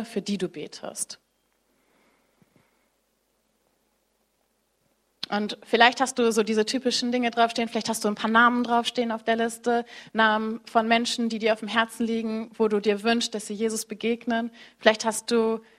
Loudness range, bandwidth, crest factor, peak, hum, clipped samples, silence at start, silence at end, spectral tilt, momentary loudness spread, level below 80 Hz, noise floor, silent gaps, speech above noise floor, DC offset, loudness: 14 LU; 15 kHz; 26 dB; 0 dBFS; none; under 0.1%; 0 s; 0.2 s; -3 dB/octave; 12 LU; -70 dBFS; -71 dBFS; none; 47 dB; under 0.1%; -24 LUFS